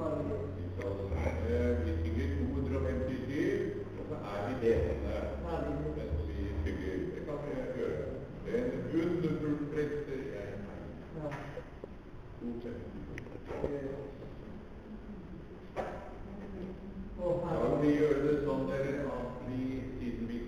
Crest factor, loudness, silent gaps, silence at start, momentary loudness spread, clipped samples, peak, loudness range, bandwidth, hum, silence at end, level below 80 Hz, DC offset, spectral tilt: 18 dB; -36 LUFS; none; 0 s; 15 LU; under 0.1%; -16 dBFS; 10 LU; 11 kHz; none; 0 s; -46 dBFS; under 0.1%; -8.5 dB/octave